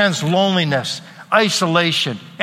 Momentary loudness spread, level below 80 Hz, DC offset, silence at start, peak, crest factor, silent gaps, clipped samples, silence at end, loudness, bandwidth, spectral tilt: 8 LU; -62 dBFS; under 0.1%; 0 s; 0 dBFS; 18 dB; none; under 0.1%; 0 s; -17 LUFS; 15.5 kHz; -4 dB/octave